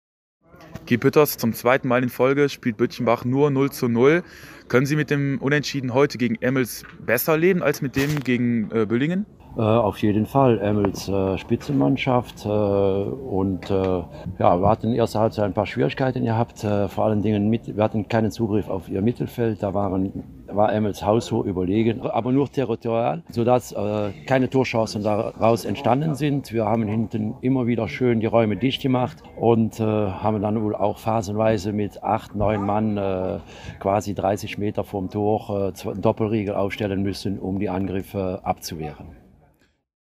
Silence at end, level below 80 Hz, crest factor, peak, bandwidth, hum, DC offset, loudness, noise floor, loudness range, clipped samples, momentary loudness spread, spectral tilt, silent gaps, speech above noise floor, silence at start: 0.85 s; -50 dBFS; 20 dB; -2 dBFS; 15.5 kHz; none; under 0.1%; -22 LUFS; -61 dBFS; 4 LU; under 0.1%; 7 LU; -7 dB/octave; none; 39 dB; 0.6 s